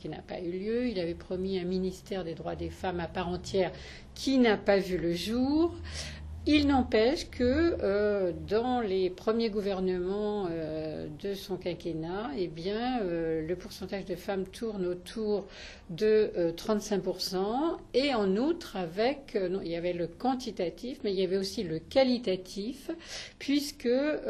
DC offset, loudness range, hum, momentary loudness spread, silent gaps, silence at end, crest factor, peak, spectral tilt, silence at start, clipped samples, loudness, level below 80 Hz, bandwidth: under 0.1%; 6 LU; none; 11 LU; none; 0 s; 18 dB; -12 dBFS; -5.5 dB/octave; 0 s; under 0.1%; -31 LUFS; -50 dBFS; 13.5 kHz